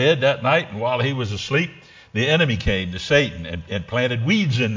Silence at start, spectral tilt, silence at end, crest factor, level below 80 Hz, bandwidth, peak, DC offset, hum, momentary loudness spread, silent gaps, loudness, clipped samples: 0 s; -5.5 dB/octave; 0 s; 18 dB; -40 dBFS; 7.6 kHz; -4 dBFS; under 0.1%; none; 10 LU; none; -21 LUFS; under 0.1%